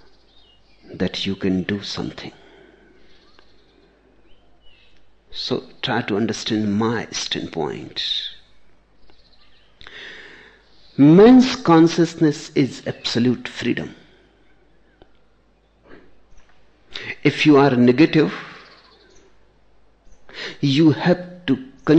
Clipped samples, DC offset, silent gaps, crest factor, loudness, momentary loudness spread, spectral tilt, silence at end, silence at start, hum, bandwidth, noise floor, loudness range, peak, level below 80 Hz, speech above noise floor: under 0.1%; under 0.1%; none; 18 dB; -18 LUFS; 22 LU; -6 dB/octave; 0 s; 0.9 s; none; 8.4 kHz; -58 dBFS; 15 LU; -2 dBFS; -54 dBFS; 41 dB